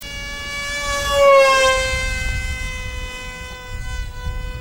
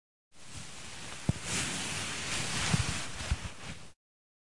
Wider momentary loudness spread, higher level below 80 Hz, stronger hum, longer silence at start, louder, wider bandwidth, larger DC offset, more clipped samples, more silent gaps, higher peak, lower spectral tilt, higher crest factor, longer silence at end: first, 19 LU vs 16 LU; first, -28 dBFS vs -48 dBFS; neither; second, 0 s vs 0.3 s; first, -17 LUFS vs -34 LUFS; first, 16.5 kHz vs 11.5 kHz; second, under 0.1% vs 0.5%; neither; neither; first, -2 dBFS vs -14 dBFS; about the same, -2.5 dB/octave vs -3 dB/octave; second, 18 dB vs 24 dB; second, 0 s vs 0.65 s